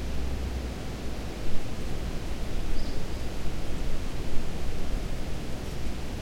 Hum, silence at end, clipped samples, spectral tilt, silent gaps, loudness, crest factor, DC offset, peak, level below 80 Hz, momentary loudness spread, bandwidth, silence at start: none; 0 s; under 0.1%; -5.5 dB/octave; none; -36 LUFS; 16 dB; under 0.1%; -10 dBFS; -32 dBFS; 2 LU; 12 kHz; 0 s